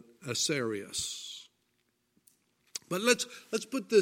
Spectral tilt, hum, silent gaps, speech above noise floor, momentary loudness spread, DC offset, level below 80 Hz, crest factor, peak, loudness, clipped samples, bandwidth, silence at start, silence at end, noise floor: -2.5 dB/octave; none; none; 46 dB; 16 LU; under 0.1%; -74 dBFS; 24 dB; -10 dBFS; -32 LUFS; under 0.1%; 16.5 kHz; 0.2 s; 0 s; -76 dBFS